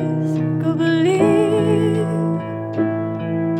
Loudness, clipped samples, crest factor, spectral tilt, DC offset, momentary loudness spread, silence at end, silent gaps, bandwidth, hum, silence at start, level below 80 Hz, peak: -19 LUFS; under 0.1%; 14 dB; -7.5 dB/octave; under 0.1%; 8 LU; 0 s; none; 9.8 kHz; none; 0 s; -58 dBFS; -4 dBFS